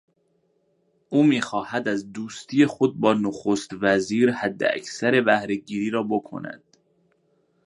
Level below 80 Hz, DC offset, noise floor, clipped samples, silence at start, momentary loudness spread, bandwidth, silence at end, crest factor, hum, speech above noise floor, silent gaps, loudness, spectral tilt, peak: -66 dBFS; under 0.1%; -68 dBFS; under 0.1%; 1.1 s; 11 LU; 11 kHz; 1.1 s; 20 dB; none; 45 dB; none; -23 LUFS; -5.5 dB/octave; -4 dBFS